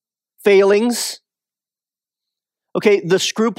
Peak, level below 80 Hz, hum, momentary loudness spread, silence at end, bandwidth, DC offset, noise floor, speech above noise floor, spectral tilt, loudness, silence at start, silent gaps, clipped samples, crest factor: -2 dBFS; -76 dBFS; none; 13 LU; 0.05 s; 16 kHz; under 0.1%; under -90 dBFS; over 75 dB; -4 dB/octave; -16 LUFS; 0.45 s; none; under 0.1%; 16 dB